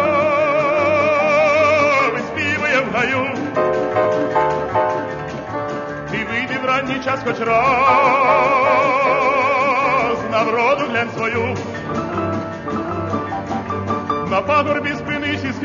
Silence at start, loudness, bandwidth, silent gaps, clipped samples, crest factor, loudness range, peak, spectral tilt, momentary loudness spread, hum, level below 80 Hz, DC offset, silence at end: 0 s; -17 LUFS; 7.4 kHz; none; under 0.1%; 14 dB; 6 LU; -4 dBFS; -5.5 dB/octave; 10 LU; none; -48 dBFS; under 0.1%; 0 s